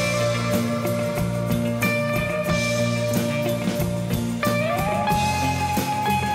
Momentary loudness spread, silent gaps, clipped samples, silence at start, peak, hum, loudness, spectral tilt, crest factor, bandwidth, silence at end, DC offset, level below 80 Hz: 3 LU; none; under 0.1%; 0 s; -10 dBFS; none; -23 LUFS; -5.5 dB/octave; 14 dB; 16 kHz; 0 s; under 0.1%; -42 dBFS